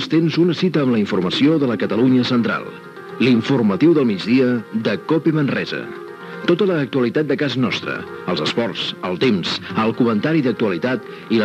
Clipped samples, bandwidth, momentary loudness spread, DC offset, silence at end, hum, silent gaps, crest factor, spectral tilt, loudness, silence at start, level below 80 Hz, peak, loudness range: under 0.1%; 9.2 kHz; 10 LU; under 0.1%; 0 s; none; none; 14 dB; -7 dB/octave; -18 LUFS; 0 s; -72 dBFS; -4 dBFS; 3 LU